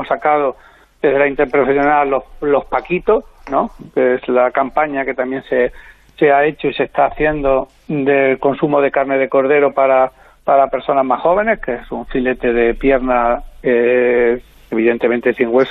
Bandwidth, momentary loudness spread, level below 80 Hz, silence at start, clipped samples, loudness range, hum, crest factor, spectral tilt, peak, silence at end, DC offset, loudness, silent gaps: 5.6 kHz; 7 LU; -38 dBFS; 0 s; under 0.1%; 2 LU; none; 14 dB; -8 dB/octave; -2 dBFS; 0 s; under 0.1%; -15 LUFS; none